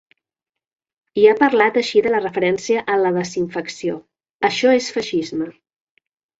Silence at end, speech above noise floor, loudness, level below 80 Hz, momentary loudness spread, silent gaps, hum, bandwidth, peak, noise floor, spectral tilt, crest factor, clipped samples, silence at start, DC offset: 0.9 s; 68 dB; -18 LUFS; -62 dBFS; 12 LU; 4.33-4.40 s; none; 8 kHz; 0 dBFS; -86 dBFS; -4.5 dB/octave; 18 dB; under 0.1%; 1.15 s; under 0.1%